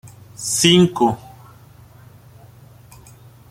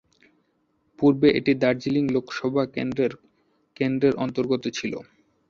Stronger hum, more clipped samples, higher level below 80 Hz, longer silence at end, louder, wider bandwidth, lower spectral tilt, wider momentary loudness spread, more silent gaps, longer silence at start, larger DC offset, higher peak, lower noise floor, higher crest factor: neither; neither; first, -52 dBFS vs -60 dBFS; first, 2.35 s vs 0.45 s; first, -16 LUFS vs -24 LUFS; first, 16 kHz vs 7.4 kHz; second, -4 dB/octave vs -6.5 dB/octave; first, 19 LU vs 9 LU; neither; second, 0.05 s vs 1 s; neither; first, 0 dBFS vs -6 dBFS; second, -45 dBFS vs -69 dBFS; about the same, 22 dB vs 20 dB